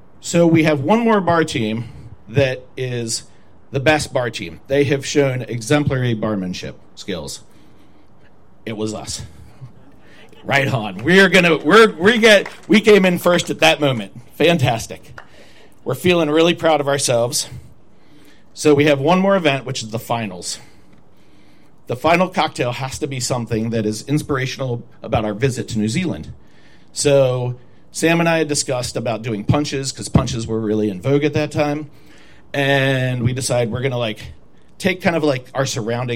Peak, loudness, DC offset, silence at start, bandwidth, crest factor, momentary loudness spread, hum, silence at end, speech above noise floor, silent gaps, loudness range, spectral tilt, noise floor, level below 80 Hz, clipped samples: -2 dBFS; -17 LUFS; 0.9%; 0.25 s; 16.5 kHz; 18 dB; 15 LU; none; 0 s; 34 dB; none; 9 LU; -5 dB/octave; -51 dBFS; -48 dBFS; under 0.1%